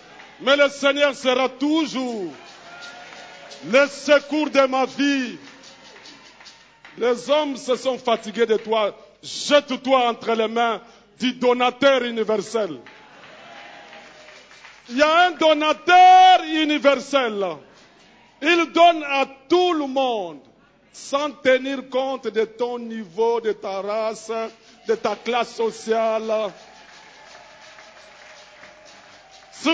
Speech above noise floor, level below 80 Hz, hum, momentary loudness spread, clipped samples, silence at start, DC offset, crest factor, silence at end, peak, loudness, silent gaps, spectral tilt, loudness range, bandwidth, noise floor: 32 dB; -68 dBFS; none; 19 LU; under 0.1%; 0.2 s; under 0.1%; 18 dB; 0 s; -2 dBFS; -20 LUFS; none; -3 dB/octave; 9 LU; 8 kHz; -52 dBFS